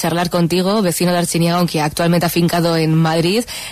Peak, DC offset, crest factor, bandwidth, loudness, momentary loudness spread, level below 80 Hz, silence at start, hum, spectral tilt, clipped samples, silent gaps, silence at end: -4 dBFS; 0.2%; 10 dB; 14 kHz; -15 LUFS; 2 LU; -46 dBFS; 0 s; none; -5 dB/octave; under 0.1%; none; 0 s